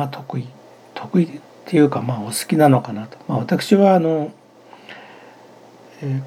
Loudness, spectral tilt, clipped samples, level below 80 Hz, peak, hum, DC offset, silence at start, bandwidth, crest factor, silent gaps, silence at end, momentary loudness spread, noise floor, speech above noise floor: -18 LUFS; -6.5 dB/octave; under 0.1%; -76 dBFS; 0 dBFS; none; under 0.1%; 0 s; 16 kHz; 18 dB; none; 0 s; 23 LU; -45 dBFS; 28 dB